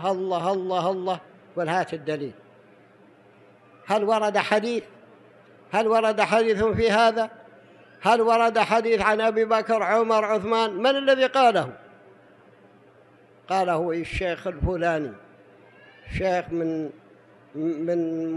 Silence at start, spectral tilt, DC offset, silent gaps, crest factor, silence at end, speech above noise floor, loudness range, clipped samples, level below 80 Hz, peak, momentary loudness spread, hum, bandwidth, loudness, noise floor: 0 s; -5.5 dB/octave; under 0.1%; none; 18 dB; 0 s; 32 dB; 8 LU; under 0.1%; -48 dBFS; -6 dBFS; 11 LU; none; 12 kHz; -23 LUFS; -54 dBFS